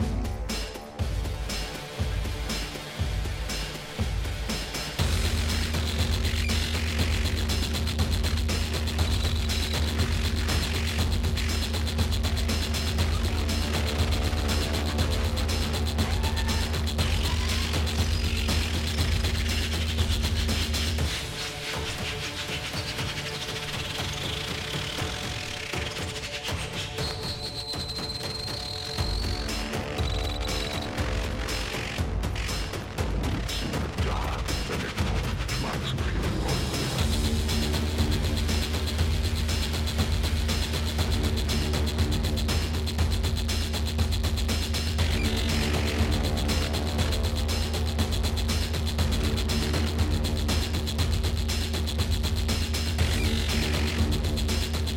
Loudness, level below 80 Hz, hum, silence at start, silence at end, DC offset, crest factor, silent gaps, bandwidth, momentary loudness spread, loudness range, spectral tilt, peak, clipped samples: -28 LUFS; -30 dBFS; none; 0 s; 0 s; under 0.1%; 14 dB; none; 17 kHz; 5 LU; 4 LU; -4.5 dB/octave; -12 dBFS; under 0.1%